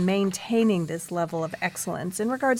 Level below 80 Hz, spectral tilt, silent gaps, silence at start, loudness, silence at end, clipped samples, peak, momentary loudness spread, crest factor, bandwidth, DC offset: -66 dBFS; -5 dB/octave; none; 0 s; -26 LUFS; 0 s; under 0.1%; -12 dBFS; 7 LU; 14 dB; 16.5 kHz; under 0.1%